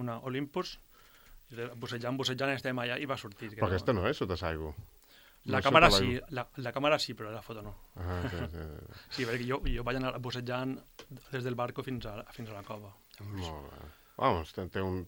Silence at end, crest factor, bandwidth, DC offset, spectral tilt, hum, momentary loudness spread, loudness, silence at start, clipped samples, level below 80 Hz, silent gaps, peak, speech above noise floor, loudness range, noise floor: 0 s; 30 dB; over 20 kHz; under 0.1%; -5 dB/octave; none; 17 LU; -33 LUFS; 0 s; under 0.1%; -48 dBFS; none; -4 dBFS; 23 dB; 9 LU; -57 dBFS